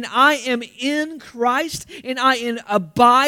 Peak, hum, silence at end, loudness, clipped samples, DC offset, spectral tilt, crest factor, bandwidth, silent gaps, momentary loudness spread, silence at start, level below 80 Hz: 0 dBFS; none; 0 s; -19 LUFS; under 0.1%; under 0.1%; -3.5 dB/octave; 18 dB; 18 kHz; none; 12 LU; 0 s; -58 dBFS